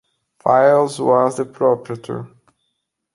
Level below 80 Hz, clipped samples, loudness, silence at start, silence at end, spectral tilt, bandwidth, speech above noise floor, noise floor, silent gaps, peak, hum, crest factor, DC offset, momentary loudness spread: -64 dBFS; under 0.1%; -17 LUFS; 0.45 s; 0.9 s; -6 dB/octave; 11.5 kHz; 57 dB; -74 dBFS; none; -2 dBFS; none; 16 dB; under 0.1%; 15 LU